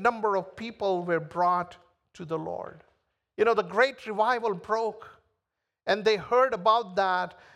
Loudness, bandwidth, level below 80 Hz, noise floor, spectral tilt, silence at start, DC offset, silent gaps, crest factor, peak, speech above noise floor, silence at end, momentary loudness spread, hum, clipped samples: -27 LUFS; 11 kHz; -68 dBFS; -84 dBFS; -5 dB/octave; 0 s; under 0.1%; none; 20 dB; -8 dBFS; 57 dB; 0.25 s; 15 LU; none; under 0.1%